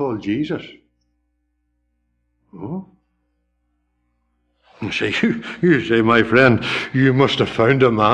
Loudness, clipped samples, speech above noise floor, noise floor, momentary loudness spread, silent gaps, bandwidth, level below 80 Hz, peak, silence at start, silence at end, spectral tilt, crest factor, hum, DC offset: -17 LUFS; under 0.1%; 52 dB; -69 dBFS; 17 LU; none; 9.6 kHz; -50 dBFS; -2 dBFS; 0 s; 0 s; -6.5 dB/octave; 18 dB; 60 Hz at -50 dBFS; under 0.1%